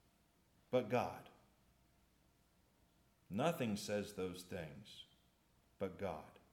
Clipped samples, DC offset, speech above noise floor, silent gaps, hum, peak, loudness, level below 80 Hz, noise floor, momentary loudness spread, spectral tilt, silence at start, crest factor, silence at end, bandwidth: under 0.1%; under 0.1%; 33 dB; none; none; -24 dBFS; -43 LUFS; -78 dBFS; -75 dBFS; 17 LU; -5.5 dB/octave; 0.7 s; 22 dB; 0.15 s; 18 kHz